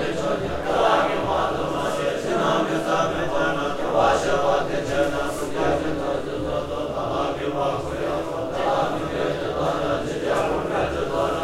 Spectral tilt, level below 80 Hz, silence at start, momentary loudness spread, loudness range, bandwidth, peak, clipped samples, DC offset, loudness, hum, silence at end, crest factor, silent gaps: -5 dB/octave; -42 dBFS; 0 s; 6 LU; 3 LU; 15.5 kHz; -6 dBFS; under 0.1%; under 0.1%; -23 LUFS; none; 0 s; 16 dB; none